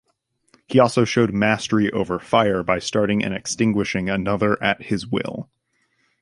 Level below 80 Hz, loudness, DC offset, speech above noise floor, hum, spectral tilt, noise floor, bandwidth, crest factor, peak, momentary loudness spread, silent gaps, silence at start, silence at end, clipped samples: -50 dBFS; -20 LUFS; under 0.1%; 49 dB; none; -5.5 dB/octave; -69 dBFS; 11.5 kHz; 20 dB; -2 dBFS; 7 LU; none; 0.7 s; 0.8 s; under 0.1%